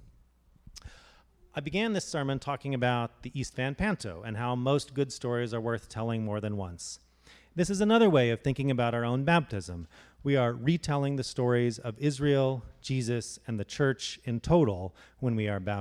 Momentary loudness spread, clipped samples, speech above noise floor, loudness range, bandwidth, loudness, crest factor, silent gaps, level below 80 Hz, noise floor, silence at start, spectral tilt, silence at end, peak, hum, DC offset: 13 LU; under 0.1%; 33 dB; 5 LU; 12 kHz; -30 LUFS; 18 dB; none; -54 dBFS; -62 dBFS; 0.65 s; -6 dB/octave; 0 s; -12 dBFS; none; under 0.1%